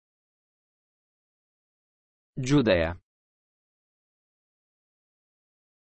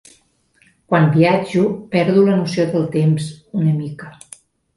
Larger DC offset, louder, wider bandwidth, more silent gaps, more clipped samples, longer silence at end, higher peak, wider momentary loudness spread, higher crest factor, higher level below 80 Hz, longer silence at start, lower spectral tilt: neither; second, -25 LUFS vs -17 LUFS; second, 5 kHz vs 11.5 kHz; neither; neither; first, 2.85 s vs 0.65 s; second, -10 dBFS vs -2 dBFS; first, 21 LU vs 11 LU; first, 24 dB vs 16 dB; about the same, -54 dBFS vs -56 dBFS; first, 2.35 s vs 0.9 s; second, -5.5 dB/octave vs -7.5 dB/octave